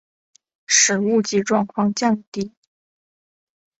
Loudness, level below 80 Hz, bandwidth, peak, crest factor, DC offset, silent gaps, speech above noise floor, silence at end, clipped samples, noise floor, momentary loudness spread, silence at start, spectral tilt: -18 LUFS; -64 dBFS; 8.2 kHz; -2 dBFS; 20 dB; under 0.1%; 2.27-2.32 s; over 70 dB; 1.3 s; under 0.1%; under -90 dBFS; 15 LU; 0.7 s; -3 dB/octave